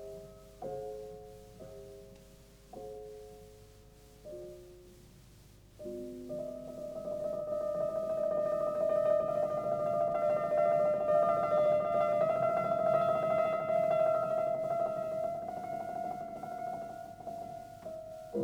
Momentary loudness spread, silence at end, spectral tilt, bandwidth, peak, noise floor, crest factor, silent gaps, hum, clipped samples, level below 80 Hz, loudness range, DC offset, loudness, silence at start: 21 LU; 0 s; -7 dB/octave; 16.5 kHz; -18 dBFS; -57 dBFS; 16 dB; none; none; under 0.1%; -64 dBFS; 21 LU; under 0.1%; -33 LUFS; 0 s